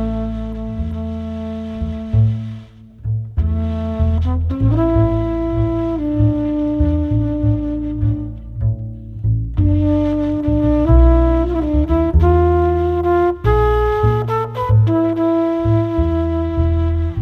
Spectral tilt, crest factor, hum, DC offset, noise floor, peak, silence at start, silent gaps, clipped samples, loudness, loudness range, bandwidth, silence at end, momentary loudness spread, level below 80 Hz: -10.5 dB/octave; 16 dB; none; under 0.1%; -37 dBFS; 0 dBFS; 0 s; none; under 0.1%; -17 LUFS; 6 LU; 4.6 kHz; 0 s; 11 LU; -22 dBFS